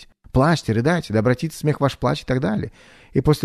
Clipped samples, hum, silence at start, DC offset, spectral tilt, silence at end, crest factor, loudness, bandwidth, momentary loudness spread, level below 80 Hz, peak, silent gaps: under 0.1%; none; 0 s; under 0.1%; -7 dB/octave; 0 s; 18 dB; -21 LUFS; 13.5 kHz; 6 LU; -40 dBFS; -2 dBFS; none